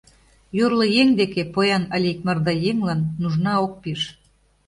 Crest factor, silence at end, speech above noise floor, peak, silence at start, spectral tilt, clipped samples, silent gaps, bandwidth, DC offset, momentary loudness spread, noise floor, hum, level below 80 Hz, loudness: 16 dB; 0.55 s; 27 dB; -4 dBFS; 0.55 s; -6.5 dB/octave; under 0.1%; none; 11.5 kHz; under 0.1%; 11 LU; -47 dBFS; none; -54 dBFS; -21 LUFS